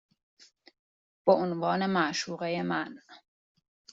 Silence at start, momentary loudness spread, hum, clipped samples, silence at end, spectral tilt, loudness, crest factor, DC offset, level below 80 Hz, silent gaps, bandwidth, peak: 1.25 s; 7 LU; none; under 0.1%; 0.75 s; -4 dB/octave; -29 LUFS; 22 dB; under 0.1%; -74 dBFS; none; 7.8 kHz; -10 dBFS